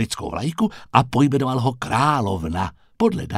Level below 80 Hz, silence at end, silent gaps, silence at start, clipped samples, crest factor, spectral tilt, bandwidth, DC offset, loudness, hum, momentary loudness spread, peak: -44 dBFS; 0 s; none; 0 s; under 0.1%; 20 dB; -6 dB/octave; 15 kHz; under 0.1%; -21 LUFS; none; 7 LU; 0 dBFS